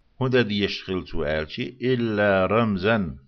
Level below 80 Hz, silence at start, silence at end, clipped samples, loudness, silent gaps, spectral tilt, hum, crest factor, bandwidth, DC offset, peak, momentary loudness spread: -46 dBFS; 0.2 s; 0.1 s; under 0.1%; -23 LUFS; none; -7.5 dB/octave; none; 16 dB; 6.6 kHz; under 0.1%; -8 dBFS; 8 LU